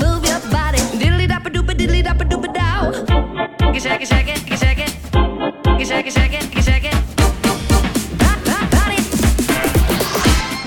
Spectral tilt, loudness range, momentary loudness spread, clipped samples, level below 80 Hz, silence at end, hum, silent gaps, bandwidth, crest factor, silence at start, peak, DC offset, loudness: -4.5 dB/octave; 2 LU; 4 LU; under 0.1%; -20 dBFS; 0 s; none; none; 18.5 kHz; 14 dB; 0 s; 0 dBFS; under 0.1%; -17 LUFS